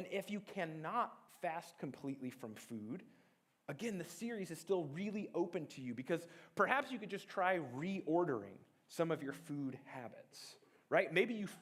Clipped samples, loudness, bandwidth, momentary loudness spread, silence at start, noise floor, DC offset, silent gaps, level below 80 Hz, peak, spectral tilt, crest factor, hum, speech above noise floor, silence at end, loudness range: under 0.1%; -41 LUFS; 16 kHz; 15 LU; 0 s; -74 dBFS; under 0.1%; none; -88 dBFS; -16 dBFS; -5.5 dB/octave; 24 dB; none; 33 dB; 0 s; 7 LU